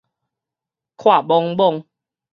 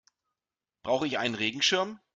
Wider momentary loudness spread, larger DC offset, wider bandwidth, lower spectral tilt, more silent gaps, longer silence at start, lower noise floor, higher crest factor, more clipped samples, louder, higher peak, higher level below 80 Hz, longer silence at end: about the same, 5 LU vs 6 LU; neither; second, 6.6 kHz vs 9.4 kHz; first, -7.5 dB/octave vs -2.5 dB/octave; neither; first, 1 s vs 0.85 s; about the same, -87 dBFS vs under -90 dBFS; about the same, 18 dB vs 20 dB; neither; first, -16 LUFS vs -28 LUFS; first, -2 dBFS vs -12 dBFS; about the same, -72 dBFS vs -70 dBFS; first, 0.5 s vs 0.2 s